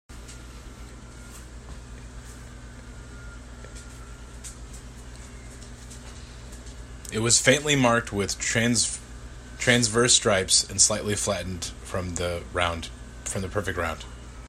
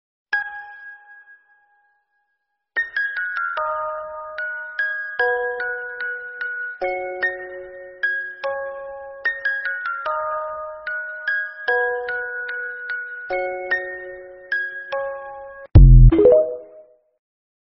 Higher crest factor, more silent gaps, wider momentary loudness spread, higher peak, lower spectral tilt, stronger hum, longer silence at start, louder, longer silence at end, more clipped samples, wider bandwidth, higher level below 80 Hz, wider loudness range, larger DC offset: about the same, 24 dB vs 20 dB; neither; first, 24 LU vs 18 LU; second, -4 dBFS vs 0 dBFS; second, -2.5 dB/octave vs -6 dB/octave; first, 60 Hz at -50 dBFS vs none; second, 0.1 s vs 0.3 s; about the same, -23 LUFS vs -21 LUFS; second, 0 s vs 1 s; neither; first, 16 kHz vs 5.6 kHz; second, -44 dBFS vs -24 dBFS; first, 21 LU vs 10 LU; neither